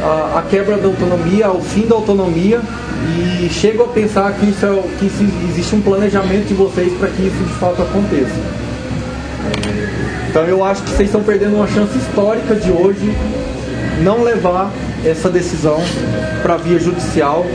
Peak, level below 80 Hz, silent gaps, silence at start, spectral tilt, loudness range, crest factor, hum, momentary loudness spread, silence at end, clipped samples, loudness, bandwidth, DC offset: 0 dBFS; -30 dBFS; none; 0 s; -6.5 dB/octave; 3 LU; 14 dB; none; 7 LU; 0 s; under 0.1%; -15 LUFS; 10.5 kHz; under 0.1%